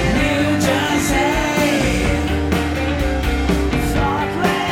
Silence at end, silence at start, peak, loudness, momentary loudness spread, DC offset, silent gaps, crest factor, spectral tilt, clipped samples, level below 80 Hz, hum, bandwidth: 0 s; 0 s; -4 dBFS; -18 LUFS; 3 LU; under 0.1%; none; 14 dB; -5 dB/octave; under 0.1%; -24 dBFS; none; 17 kHz